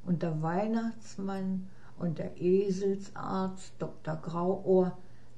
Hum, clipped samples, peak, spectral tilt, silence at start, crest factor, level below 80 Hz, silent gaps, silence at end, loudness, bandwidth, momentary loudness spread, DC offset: none; under 0.1%; -16 dBFS; -8 dB/octave; 0.05 s; 16 dB; -60 dBFS; none; 0.2 s; -32 LUFS; 9 kHz; 11 LU; 0.8%